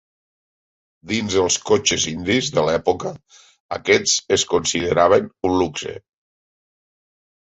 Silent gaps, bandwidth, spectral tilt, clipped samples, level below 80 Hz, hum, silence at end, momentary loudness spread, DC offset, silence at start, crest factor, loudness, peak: 3.60-3.69 s; 8.4 kHz; -3 dB/octave; under 0.1%; -48 dBFS; none; 1.5 s; 11 LU; under 0.1%; 1.05 s; 20 dB; -19 LUFS; -2 dBFS